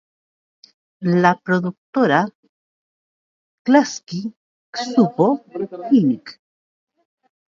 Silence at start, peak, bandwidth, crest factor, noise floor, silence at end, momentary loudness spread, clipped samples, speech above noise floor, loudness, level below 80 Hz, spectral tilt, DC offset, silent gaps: 1 s; 0 dBFS; 7.4 kHz; 20 dB; under -90 dBFS; 1.25 s; 13 LU; under 0.1%; over 72 dB; -19 LUFS; -70 dBFS; -6 dB/octave; under 0.1%; 1.78-1.93 s, 2.35-2.43 s, 2.49-3.65 s, 4.37-4.73 s